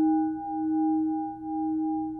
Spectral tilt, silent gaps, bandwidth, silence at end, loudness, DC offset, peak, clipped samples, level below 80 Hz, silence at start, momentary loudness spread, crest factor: -12 dB/octave; none; 1.6 kHz; 0 s; -28 LUFS; under 0.1%; -18 dBFS; under 0.1%; -62 dBFS; 0 s; 6 LU; 10 dB